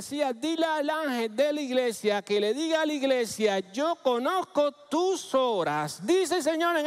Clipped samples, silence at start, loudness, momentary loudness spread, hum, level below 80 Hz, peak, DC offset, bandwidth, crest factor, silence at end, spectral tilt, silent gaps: under 0.1%; 0 s; -27 LUFS; 3 LU; none; -76 dBFS; -12 dBFS; under 0.1%; 16 kHz; 16 dB; 0 s; -3.5 dB/octave; none